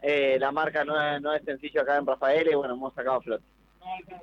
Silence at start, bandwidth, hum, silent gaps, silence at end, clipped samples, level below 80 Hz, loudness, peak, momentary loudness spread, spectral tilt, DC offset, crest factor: 0 s; 7 kHz; none; none; 0 s; under 0.1%; -64 dBFS; -27 LUFS; -16 dBFS; 13 LU; -6 dB/octave; under 0.1%; 12 dB